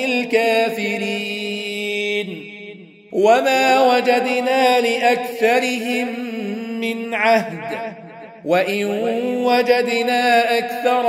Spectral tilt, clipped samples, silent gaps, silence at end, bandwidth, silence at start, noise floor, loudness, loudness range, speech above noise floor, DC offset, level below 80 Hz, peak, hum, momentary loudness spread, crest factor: -4 dB/octave; under 0.1%; none; 0 s; 16 kHz; 0 s; -39 dBFS; -18 LUFS; 5 LU; 21 dB; under 0.1%; -72 dBFS; -2 dBFS; none; 13 LU; 18 dB